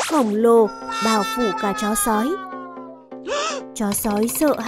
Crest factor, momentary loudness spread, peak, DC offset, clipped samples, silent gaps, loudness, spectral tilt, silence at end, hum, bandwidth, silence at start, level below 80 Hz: 16 dB; 18 LU; -6 dBFS; under 0.1%; under 0.1%; none; -20 LUFS; -3.5 dB/octave; 0 s; none; 16 kHz; 0 s; -50 dBFS